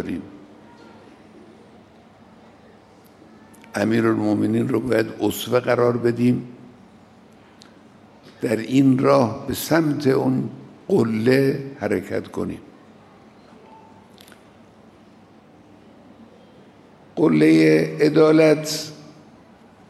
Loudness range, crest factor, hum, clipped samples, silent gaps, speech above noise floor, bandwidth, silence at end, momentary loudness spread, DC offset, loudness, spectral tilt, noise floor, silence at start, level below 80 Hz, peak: 12 LU; 18 dB; none; under 0.1%; none; 31 dB; 15 kHz; 0.85 s; 16 LU; under 0.1%; -19 LUFS; -6.5 dB/octave; -49 dBFS; 0 s; -60 dBFS; -4 dBFS